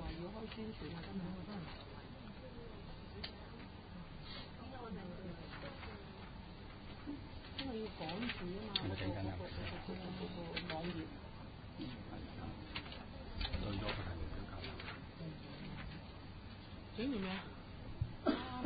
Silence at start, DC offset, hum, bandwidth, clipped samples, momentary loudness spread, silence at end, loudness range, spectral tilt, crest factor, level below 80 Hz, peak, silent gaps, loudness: 0 s; under 0.1%; none; 4.9 kHz; under 0.1%; 12 LU; 0 s; 7 LU; -4.5 dB/octave; 26 dB; -54 dBFS; -20 dBFS; none; -46 LUFS